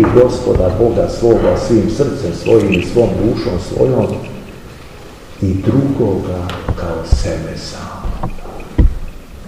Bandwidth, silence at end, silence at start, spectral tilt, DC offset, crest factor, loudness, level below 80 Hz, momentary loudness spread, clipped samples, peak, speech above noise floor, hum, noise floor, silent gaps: 15.5 kHz; 0 s; 0 s; -7.5 dB/octave; 0.7%; 14 dB; -15 LUFS; -24 dBFS; 19 LU; 0.3%; 0 dBFS; 20 dB; none; -34 dBFS; none